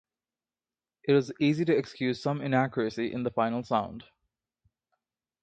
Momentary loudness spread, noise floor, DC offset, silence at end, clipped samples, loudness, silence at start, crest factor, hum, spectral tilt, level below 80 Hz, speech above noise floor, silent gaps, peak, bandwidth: 6 LU; under -90 dBFS; under 0.1%; 1.4 s; under 0.1%; -28 LUFS; 1.05 s; 20 dB; none; -7 dB/octave; -66 dBFS; over 62 dB; none; -12 dBFS; 8.8 kHz